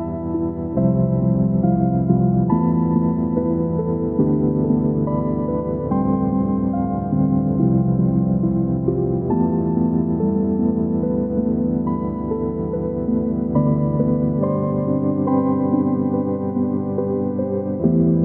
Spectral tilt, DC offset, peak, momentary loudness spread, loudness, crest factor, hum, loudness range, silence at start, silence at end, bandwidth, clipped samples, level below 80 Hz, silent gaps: -15 dB/octave; under 0.1%; -4 dBFS; 5 LU; -20 LUFS; 14 dB; none; 2 LU; 0 s; 0 s; 2.2 kHz; under 0.1%; -38 dBFS; none